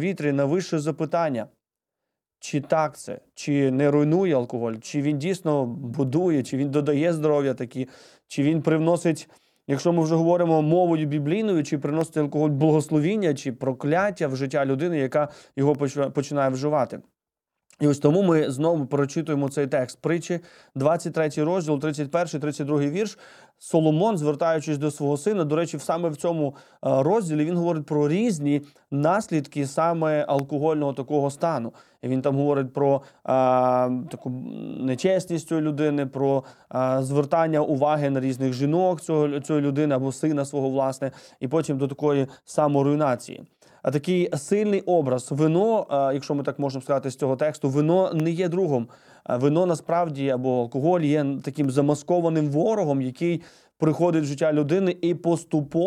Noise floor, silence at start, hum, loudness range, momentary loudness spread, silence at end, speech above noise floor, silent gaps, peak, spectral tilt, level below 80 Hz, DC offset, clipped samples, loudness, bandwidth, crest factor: -86 dBFS; 0 s; none; 2 LU; 8 LU; 0 s; 63 dB; none; -4 dBFS; -7 dB/octave; -70 dBFS; under 0.1%; under 0.1%; -24 LUFS; 13 kHz; 18 dB